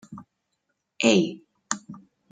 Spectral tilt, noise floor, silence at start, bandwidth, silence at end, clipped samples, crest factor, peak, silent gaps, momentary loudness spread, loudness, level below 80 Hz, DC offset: -4 dB/octave; -78 dBFS; 0.1 s; 9.6 kHz; 0.35 s; under 0.1%; 22 dB; -6 dBFS; none; 25 LU; -24 LUFS; -72 dBFS; under 0.1%